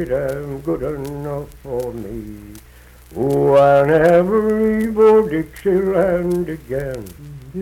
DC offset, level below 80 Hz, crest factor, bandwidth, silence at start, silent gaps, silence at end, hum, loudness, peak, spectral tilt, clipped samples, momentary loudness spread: under 0.1%; -40 dBFS; 14 dB; 16.5 kHz; 0 s; none; 0 s; none; -17 LUFS; -2 dBFS; -8 dB/octave; under 0.1%; 19 LU